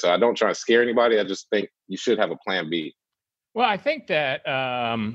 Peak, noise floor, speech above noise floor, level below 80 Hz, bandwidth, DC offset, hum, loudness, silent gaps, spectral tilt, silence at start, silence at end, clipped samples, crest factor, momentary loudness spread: -6 dBFS; -88 dBFS; 65 dB; -70 dBFS; 8 kHz; under 0.1%; none; -23 LUFS; none; -4 dB/octave; 0 s; 0 s; under 0.1%; 18 dB; 10 LU